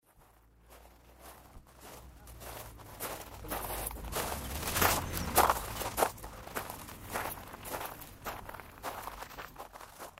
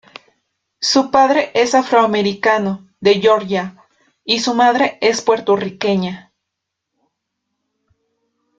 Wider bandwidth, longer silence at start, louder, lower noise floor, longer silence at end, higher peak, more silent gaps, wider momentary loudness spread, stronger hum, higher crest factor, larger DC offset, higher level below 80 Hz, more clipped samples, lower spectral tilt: first, 16 kHz vs 9.2 kHz; second, 0.15 s vs 0.8 s; second, -36 LUFS vs -15 LUFS; second, -63 dBFS vs -78 dBFS; second, 0 s vs 2.4 s; second, -8 dBFS vs 0 dBFS; neither; first, 23 LU vs 9 LU; neither; first, 30 dB vs 18 dB; neither; first, -50 dBFS vs -60 dBFS; neither; about the same, -3 dB/octave vs -4 dB/octave